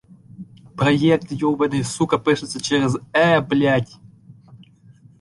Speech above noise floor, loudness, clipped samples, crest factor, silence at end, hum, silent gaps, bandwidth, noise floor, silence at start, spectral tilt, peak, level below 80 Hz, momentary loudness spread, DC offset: 31 dB; -19 LUFS; under 0.1%; 18 dB; 0.65 s; none; none; 11.5 kHz; -49 dBFS; 0.4 s; -5.5 dB/octave; -4 dBFS; -54 dBFS; 6 LU; under 0.1%